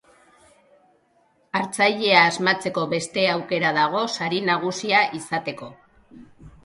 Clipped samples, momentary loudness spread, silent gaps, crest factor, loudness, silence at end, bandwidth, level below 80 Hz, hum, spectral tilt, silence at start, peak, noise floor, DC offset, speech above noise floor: under 0.1%; 12 LU; none; 24 dB; -21 LUFS; 0.15 s; 11.5 kHz; -62 dBFS; none; -3.5 dB/octave; 1.55 s; 0 dBFS; -63 dBFS; under 0.1%; 41 dB